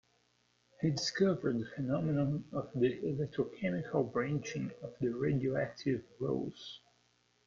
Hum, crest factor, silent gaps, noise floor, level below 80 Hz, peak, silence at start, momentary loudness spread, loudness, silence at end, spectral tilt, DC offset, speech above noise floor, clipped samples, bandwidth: 60 Hz at -55 dBFS; 18 dB; none; -74 dBFS; -66 dBFS; -18 dBFS; 0.8 s; 9 LU; -35 LUFS; 0.7 s; -6.5 dB/octave; under 0.1%; 39 dB; under 0.1%; 7.6 kHz